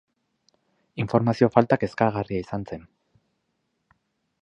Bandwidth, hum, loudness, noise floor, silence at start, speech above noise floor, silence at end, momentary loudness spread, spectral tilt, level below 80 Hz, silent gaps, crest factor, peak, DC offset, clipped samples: 8.4 kHz; none; -23 LUFS; -75 dBFS; 0.95 s; 52 dB; 1.6 s; 18 LU; -8.5 dB/octave; -56 dBFS; none; 26 dB; 0 dBFS; under 0.1%; under 0.1%